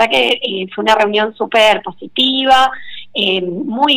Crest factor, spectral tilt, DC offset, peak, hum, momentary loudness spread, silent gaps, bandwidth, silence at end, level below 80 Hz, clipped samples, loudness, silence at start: 12 dB; -3.5 dB/octave; under 0.1%; -2 dBFS; none; 10 LU; none; 18 kHz; 0 s; -50 dBFS; under 0.1%; -13 LUFS; 0 s